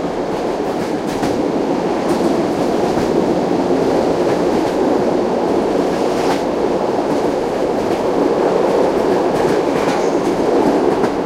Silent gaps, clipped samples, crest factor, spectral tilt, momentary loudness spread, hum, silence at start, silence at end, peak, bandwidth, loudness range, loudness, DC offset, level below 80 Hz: none; under 0.1%; 14 dB; -6 dB/octave; 3 LU; none; 0 s; 0 s; -2 dBFS; 15.5 kHz; 2 LU; -16 LUFS; under 0.1%; -44 dBFS